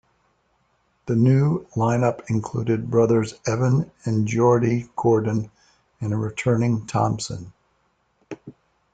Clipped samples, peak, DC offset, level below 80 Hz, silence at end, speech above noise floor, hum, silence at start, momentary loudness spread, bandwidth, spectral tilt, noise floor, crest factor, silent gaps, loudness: under 0.1%; -6 dBFS; under 0.1%; -56 dBFS; 0.45 s; 46 dB; none; 1.05 s; 15 LU; 9.2 kHz; -7.5 dB/octave; -67 dBFS; 16 dB; none; -22 LUFS